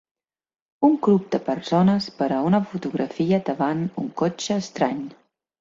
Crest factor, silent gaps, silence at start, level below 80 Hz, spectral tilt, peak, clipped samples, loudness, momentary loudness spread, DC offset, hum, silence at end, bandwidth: 18 dB; none; 0.8 s; -62 dBFS; -6.5 dB/octave; -6 dBFS; under 0.1%; -23 LUFS; 8 LU; under 0.1%; none; 0.5 s; 7.8 kHz